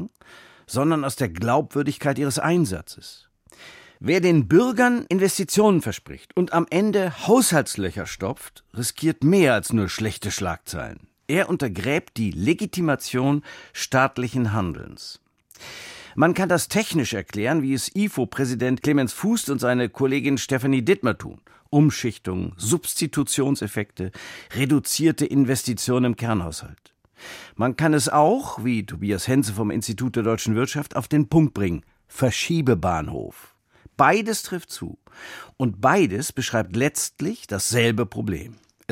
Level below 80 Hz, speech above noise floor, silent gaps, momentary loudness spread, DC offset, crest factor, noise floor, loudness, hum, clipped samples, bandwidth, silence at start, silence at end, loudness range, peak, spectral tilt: -50 dBFS; 27 dB; none; 16 LU; under 0.1%; 20 dB; -49 dBFS; -22 LUFS; none; under 0.1%; 16.5 kHz; 0 s; 0.4 s; 4 LU; -2 dBFS; -5 dB/octave